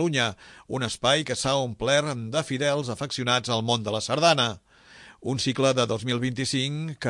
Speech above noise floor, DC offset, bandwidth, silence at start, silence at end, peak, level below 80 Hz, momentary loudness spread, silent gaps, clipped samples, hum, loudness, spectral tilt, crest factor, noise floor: 25 dB; under 0.1%; 11.5 kHz; 0 s; 0 s; -6 dBFS; -58 dBFS; 8 LU; none; under 0.1%; none; -25 LUFS; -4 dB/octave; 20 dB; -51 dBFS